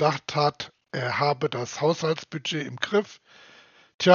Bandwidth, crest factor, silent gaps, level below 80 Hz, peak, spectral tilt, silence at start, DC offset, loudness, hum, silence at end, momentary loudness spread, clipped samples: 7.2 kHz; 24 dB; 3.94-3.99 s; -70 dBFS; -2 dBFS; -3.5 dB/octave; 0 s; under 0.1%; -26 LUFS; none; 0 s; 7 LU; under 0.1%